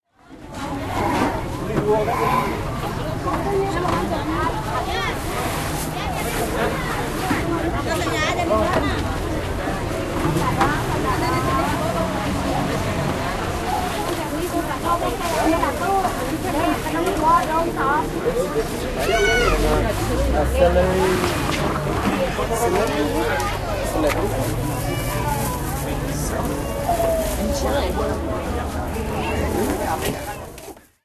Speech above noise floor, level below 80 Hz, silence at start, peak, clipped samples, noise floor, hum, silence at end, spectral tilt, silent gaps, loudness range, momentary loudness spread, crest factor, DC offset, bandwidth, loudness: 22 dB; -30 dBFS; 0.3 s; -4 dBFS; under 0.1%; -42 dBFS; none; 0.25 s; -5 dB/octave; none; 4 LU; 6 LU; 18 dB; under 0.1%; 14 kHz; -22 LUFS